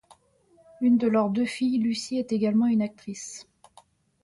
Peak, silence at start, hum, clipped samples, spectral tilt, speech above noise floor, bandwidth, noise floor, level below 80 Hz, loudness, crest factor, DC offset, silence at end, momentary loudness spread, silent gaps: -14 dBFS; 0.8 s; none; under 0.1%; -5.5 dB/octave; 37 dB; 11.5 kHz; -62 dBFS; -68 dBFS; -25 LUFS; 14 dB; under 0.1%; 0.8 s; 15 LU; none